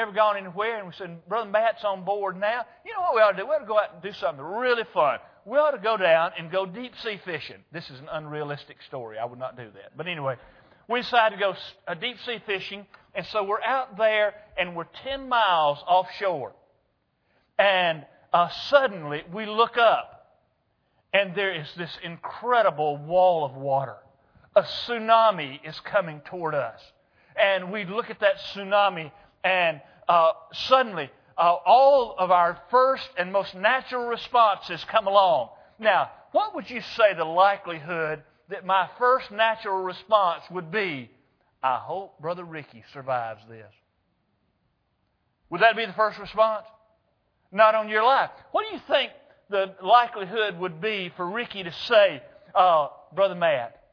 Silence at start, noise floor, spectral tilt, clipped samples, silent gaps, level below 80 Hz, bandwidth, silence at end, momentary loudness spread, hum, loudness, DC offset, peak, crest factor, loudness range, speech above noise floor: 0 s; -72 dBFS; -5.5 dB/octave; under 0.1%; none; -68 dBFS; 5.4 kHz; 0.25 s; 15 LU; none; -24 LUFS; under 0.1%; -4 dBFS; 22 dB; 7 LU; 48 dB